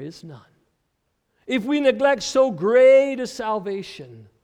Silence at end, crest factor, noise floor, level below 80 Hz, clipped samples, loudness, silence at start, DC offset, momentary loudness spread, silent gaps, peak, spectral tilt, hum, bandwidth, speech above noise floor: 0.2 s; 16 dB; -73 dBFS; -62 dBFS; under 0.1%; -19 LUFS; 0 s; under 0.1%; 19 LU; none; -6 dBFS; -4.5 dB/octave; none; 10 kHz; 53 dB